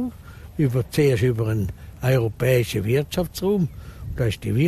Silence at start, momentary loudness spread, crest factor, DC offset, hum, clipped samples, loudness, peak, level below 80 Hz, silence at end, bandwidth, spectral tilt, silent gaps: 0 s; 11 LU; 14 dB; under 0.1%; none; under 0.1%; -23 LUFS; -8 dBFS; -40 dBFS; 0 s; 14.5 kHz; -7 dB/octave; none